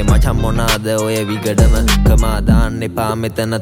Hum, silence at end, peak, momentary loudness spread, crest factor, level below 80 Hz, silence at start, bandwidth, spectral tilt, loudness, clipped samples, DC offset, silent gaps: none; 0 s; -2 dBFS; 6 LU; 12 dB; -16 dBFS; 0 s; 16.5 kHz; -5.5 dB/octave; -15 LUFS; under 0.1%; under 0.1%; none